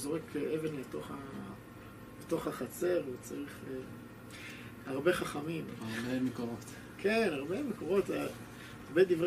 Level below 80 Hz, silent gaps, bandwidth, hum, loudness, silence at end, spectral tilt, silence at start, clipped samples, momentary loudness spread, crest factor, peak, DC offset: -64 dBFS; none; 15 kHz; none; -36 LUFS; 0 s; -5.5 dB/octave; 0 s; under 0.1%; 16 LU; 20 dB; -16 dBFS; under 0.1%